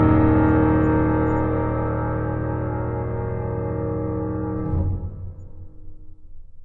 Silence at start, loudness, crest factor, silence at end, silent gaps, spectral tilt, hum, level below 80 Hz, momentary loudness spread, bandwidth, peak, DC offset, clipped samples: 0 s; -22 LUFS; 18 dB; 0 s; none; -12 dB/octave; none; -34 dBFS; 12 LU; 3.9 kHz; -4 dBFS; under 0.1%; under 0.1%